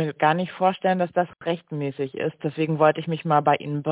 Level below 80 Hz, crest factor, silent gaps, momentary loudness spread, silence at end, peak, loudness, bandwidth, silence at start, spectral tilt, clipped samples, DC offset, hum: -70 dBFS; 18 dB; none; 8 LU; 0 s; -4 dBFS; -24 LUFS; 4 kHz; 0 s; -10.5 dB/octave; under 0.1%; under 0.1%; none